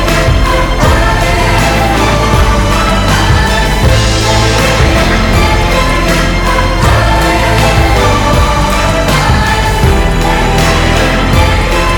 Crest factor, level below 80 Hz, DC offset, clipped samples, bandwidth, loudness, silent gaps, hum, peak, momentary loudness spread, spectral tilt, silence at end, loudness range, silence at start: 8 dB; -14 dBFS; under 0.1%; 0.2%; 19.5 kHz; -9 LUFS; none; none; 0 dBFS; 2 LU; -4.5 dB/octave; 0 s; 0 LU; 0 s